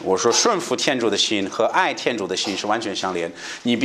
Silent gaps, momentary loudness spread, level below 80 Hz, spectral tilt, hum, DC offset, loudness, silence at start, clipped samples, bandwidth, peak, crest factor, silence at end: none; 8 LU; -66 dBFS; -2.5 dB/octave; none; under 0.1%; -21 LUFS; 0 s; under 0.1%; 14 kHz; -2 dBFS; 18 dB; 0 s